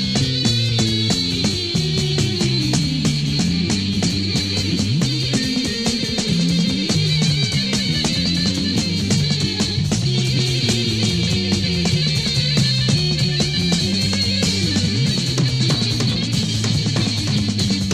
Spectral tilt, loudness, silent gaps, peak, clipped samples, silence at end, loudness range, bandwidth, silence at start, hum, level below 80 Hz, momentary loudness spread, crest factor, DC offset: -4.5 dB/octave; -18 LUFS; none; -4 dBFS; under 0.1%; 0 s; 1 LU; 15 kHz; 0 s; none; -38 dBFS; 2 LU; 14 dB; 0.3%